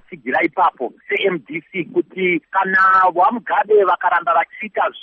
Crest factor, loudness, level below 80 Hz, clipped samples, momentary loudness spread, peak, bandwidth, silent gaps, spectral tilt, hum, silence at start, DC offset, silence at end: 14 dB; -17 LUFS; -62 dBFS; under 0.1%; 10 LU; -4 dBFS; 5.8 kHz; none; -2.5 dB/octave; none; 0.1 s; under 0.1%; 0 s